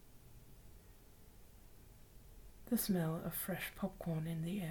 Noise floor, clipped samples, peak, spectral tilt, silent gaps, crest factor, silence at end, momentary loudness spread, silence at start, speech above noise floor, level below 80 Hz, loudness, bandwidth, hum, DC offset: -60 dBFS; under 0.1%; -26 dBFS; -5.5 dB/octave; none; 18 dB; 0 s; 26 LU; 0 s; 21 dB; -62 dBFS; -40 LUFS; 19 kHz; none; under 0.1%